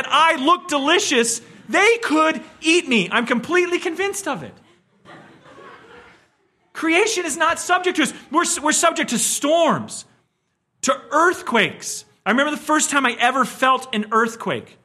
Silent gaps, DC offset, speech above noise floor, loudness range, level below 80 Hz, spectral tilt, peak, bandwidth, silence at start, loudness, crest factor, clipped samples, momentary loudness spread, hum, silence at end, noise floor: none; under 0.1%; 52 dB; 7 LU; -66 dBFS; -2 dB/octave; -2 dBFS; 15 kHz; 0 s; -18 LUFS; 18 dB; under 0.1%; 10 LU; none; 0.25 s; -71 dBFS